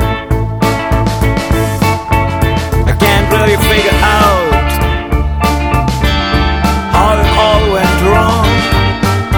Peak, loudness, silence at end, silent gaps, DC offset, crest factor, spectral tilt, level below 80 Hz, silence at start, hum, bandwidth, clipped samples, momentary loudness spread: 0 dBFS; -11 LUFS; 0 s; none; under 0.1%; 10 dB; -5.5 dB/octave; -16 dBFS; 0 s; none; 19.5 kHz; under 0.1%; 5 LU